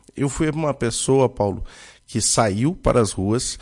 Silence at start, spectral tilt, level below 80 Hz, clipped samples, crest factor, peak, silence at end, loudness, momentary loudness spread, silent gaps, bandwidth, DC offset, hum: 0.15 s; -4.5 dB/octave; -38 dBFS; under 0.1%; 16 dB; -6 dBFS; 0 s; -20 LUFS; 8 LU; none; 11.5 kHz; under 0.1%; none